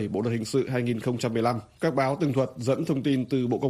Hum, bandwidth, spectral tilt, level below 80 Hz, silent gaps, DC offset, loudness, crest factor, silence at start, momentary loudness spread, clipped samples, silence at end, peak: none; 14.5 kHz; -7 dB/octave; -60 dBFS; none; under 0.1%; -27 LUFS; 14 dB; 0 s; 3 LU; under 0.1%; 0 s; -12 dBFS